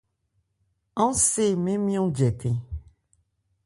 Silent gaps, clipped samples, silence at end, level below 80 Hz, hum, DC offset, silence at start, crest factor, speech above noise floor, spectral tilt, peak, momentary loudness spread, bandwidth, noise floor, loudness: none; under 0.1%; 0.85 s; -48 dBFS; none; under 0.1%; 0.95 s; 18 dB; 50 dB; -5.5 dB/octave; -8 dBFS; 15 LU; 11.5 kHz; -73 dBFS; -24 LUFS